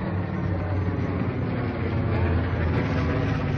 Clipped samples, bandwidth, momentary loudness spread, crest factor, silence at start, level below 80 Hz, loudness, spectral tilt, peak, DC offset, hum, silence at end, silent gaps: under 0.1%; 6.4 kHz; 3 LU; 10 dB; 0 s; -40 dBFS; -26 LUFS; -9 dB/octave; -14 dBFS; under 0.1%; none; 0 s; none